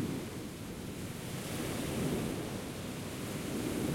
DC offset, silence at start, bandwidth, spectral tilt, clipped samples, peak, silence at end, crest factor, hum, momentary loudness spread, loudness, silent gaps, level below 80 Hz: under 0.1%; 0 s; 16.5 kHz; -5 dB/octave; under 0.1%; -22 dBFS; 0 s; 16 dB; none; 7 LU; -39 LUFS; none; -56 dBFS